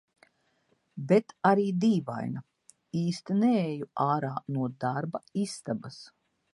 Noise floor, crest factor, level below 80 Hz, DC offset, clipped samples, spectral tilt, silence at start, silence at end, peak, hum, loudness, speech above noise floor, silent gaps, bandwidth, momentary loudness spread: -72 dBFS; 20 dB; -74 dBFS; under 0.1%; under 0.1%; -7 dB/octave; 0.95 s; 0.5 s; -8 dBFS; none; -29 LUFS; 43 dB; none; 11.5 kHz; 12 LU